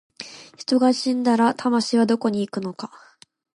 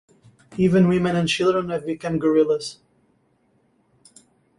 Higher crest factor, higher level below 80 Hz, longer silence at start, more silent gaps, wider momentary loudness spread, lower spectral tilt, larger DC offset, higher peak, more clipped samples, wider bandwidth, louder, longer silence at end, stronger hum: about the same, 16 dB vs 16 dB; second, -72 dBFS vs -56 dBFS; second, 0.2 s vs 0.5 s; neither; first, 18 LU vs 10 LU; second, -5 dB/octave vs -6.5 dB/octave; neither; about the same, -6 dBFS vs -6 dBFS; neither; about the same, 11 kHz vs 11.5 kHz; about the same, -21 LUFS vs -20 LUFS; second, 0.6 s vs 1.85 s; neither